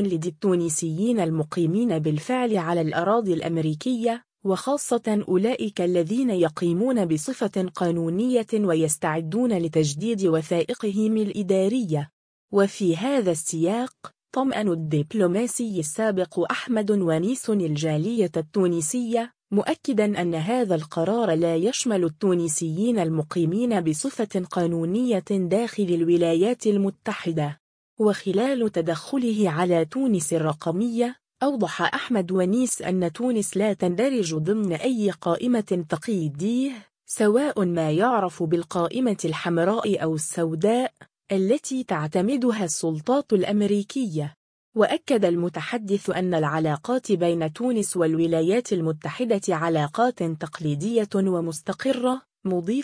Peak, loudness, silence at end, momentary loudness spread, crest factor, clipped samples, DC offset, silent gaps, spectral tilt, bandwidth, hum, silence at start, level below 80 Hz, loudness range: -6 dBFS; -24 LUFS; 0 s; 5 LU; 18 dB; under 0.1%; under 0.1%; 12.13-12.48 s, 27.60-27.97 s, 44.36-44.72 s; -5.5 dB/octave; 10.5 kHz; none; 0 s; -66 dBFS; 1 LU